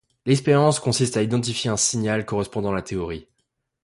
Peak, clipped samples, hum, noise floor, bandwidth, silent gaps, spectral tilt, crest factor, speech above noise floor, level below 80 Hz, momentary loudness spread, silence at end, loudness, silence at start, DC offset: -6 dBFS; under 0.1%; none; -74 dBFS; 11.5 kHz; none; -4.5 dB/octave; 18 dB; 53 dB; -50 dBFS; 11 LU; 0.6 s; -22 LUFS; 0.25 s; under 0.1%